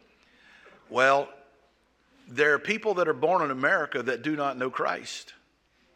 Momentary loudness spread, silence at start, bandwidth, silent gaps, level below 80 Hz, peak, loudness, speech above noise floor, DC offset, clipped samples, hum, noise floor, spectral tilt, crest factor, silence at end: 12 LU; 0.9 s; 11 kHz; none; -76 dBFS; -6 dBFS; -26 LUFS; 40 dB; under 0.1%; under 0.1%; none; -66 dBFS; -4 dB/octave; 22 dB; 0.65 s